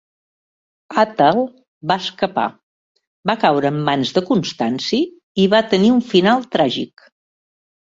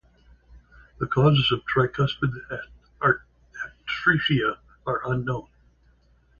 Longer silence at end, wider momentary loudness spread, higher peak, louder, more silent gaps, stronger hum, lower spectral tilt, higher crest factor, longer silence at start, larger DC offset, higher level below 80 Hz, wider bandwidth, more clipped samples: about the same, 1.05 s vs 1 s; second, 10 LU vs 16 LU; first, -2 dBFS vs -6 dBFS; first, -17 LUFS vs -24 LUFS; first, 1.68-1.81 s, 2.63-2.95 s, 3.07-3.23 s, 5.23-5.35 s vs none; neither; second, -6 dB/octave vs -7.5 dB/octave; about the same, 16 dB vs 20 dB; first, 0.9 s vs 0.5 s; neither; second, -58 dBFS vs -52 dBFS; first, 7.8 kHz vs 7 kHz; neither